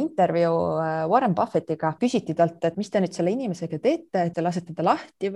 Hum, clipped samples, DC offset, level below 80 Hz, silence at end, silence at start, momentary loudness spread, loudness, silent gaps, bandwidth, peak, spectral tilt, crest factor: none; under 0.1%; under 0.1%; -64 dBFS; 0 s; 0 s; 6 LU; -24 LUFS; none; 11 kHz; -6 dBFS; -7 dB/octave; 18 dB